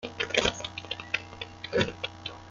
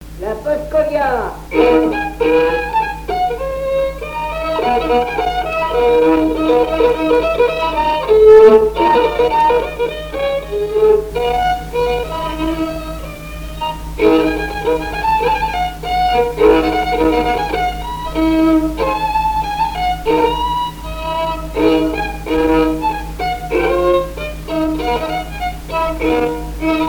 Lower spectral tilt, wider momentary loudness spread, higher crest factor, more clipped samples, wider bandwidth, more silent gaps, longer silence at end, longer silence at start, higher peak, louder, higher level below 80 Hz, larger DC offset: second, -3 dB/octave vs -6 dB/octave; first, 13 LU vs 9 LU; first, 24 dB vs 14 dB; neither; second, 9.6 kHz vs over 20 kHz; neither; about the same, 0 s vs 0 s; about the same, 0 s vs 0 s; second, -8 dBFS vs 0 dBFS; second, -30 LUFS vs -15 LUFS; second, -52 dBFS vs -30 dBFS; second, under 0.1% vs 0.2%